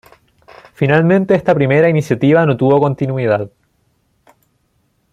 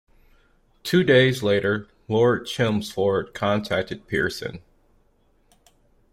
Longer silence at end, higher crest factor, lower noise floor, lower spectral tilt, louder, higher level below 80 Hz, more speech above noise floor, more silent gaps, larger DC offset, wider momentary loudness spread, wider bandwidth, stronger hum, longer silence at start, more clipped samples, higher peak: about the same, 1.65 s vs 1.55 s; about the same, 14 dB vs 18 dB; about the same, -62 dBFS vs -62 dBFS; first, -8.5 dB/octave vs -6 dB/octave; first, -13 LUFS vs -22 LUFS; about the same, -52 dBFS vs -54 dBFS; first, 49 dB vs 40 dB; neither; neither; second, 6 LU vs 10 LU; second, 12 kHz vs 16 kHz; neither; about the same, 0.8 s vs 0.85 s; neither; first, -2 dBFS vs -6 dBFS